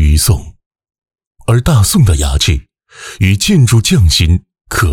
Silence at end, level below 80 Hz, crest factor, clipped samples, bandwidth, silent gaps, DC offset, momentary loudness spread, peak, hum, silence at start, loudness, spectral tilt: 0 s; -18 dBFS; 10 dB; under 0.1%; 18 kHz; 0.66-0.71 s, 1.27-1.31 s; under 0.1%; 10 LU; -2 dBFS; none; 0 s; -11 LUFS; -4.5 dB/octave